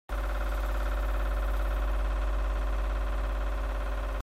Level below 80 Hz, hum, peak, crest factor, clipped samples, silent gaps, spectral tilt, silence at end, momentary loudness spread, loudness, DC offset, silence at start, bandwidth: -30 dBFS; none; -20 dBFS; 8 dB; under 0.1%; none; -6 dB/octave; 0 s; 2 LU; -33 LUFS; under 0.1%; 0.1 s; 14 kHz